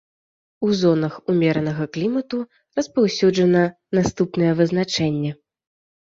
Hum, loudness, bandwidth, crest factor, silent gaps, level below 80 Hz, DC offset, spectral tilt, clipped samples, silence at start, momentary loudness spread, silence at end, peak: none; -20 LUFS; 7.8 kHz; 16 dB; none; -54 dBFS; under 0.1%; -6.5 dB/octave; under 0.1%; 0.6 s; 9 LU; 0.8 s; -4 dBFS